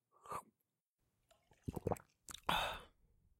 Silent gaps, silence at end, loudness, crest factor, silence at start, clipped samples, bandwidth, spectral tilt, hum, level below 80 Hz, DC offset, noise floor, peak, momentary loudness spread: 0.89-0.97 s; 0.5 s; -44 LUFS; 28 dB; 0.25 s; under 0.1%; 16.5 kHz; -4 dB/octave; none; -64 dBFS; under 0.1%; -89 dBFS; -18 dBFS; 14 LU